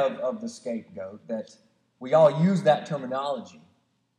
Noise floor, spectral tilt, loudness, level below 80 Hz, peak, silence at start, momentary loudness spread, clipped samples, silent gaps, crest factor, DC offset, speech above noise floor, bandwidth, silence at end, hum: -68 dBFS; -7 dB/octave; -25 LUFS; -84 dBFS; -6 dBFS; 0 s; 19 LU; under 0.1%; none; 20 dB; under 0.1%; 43 dB; 10 kHz; 0.7 s; none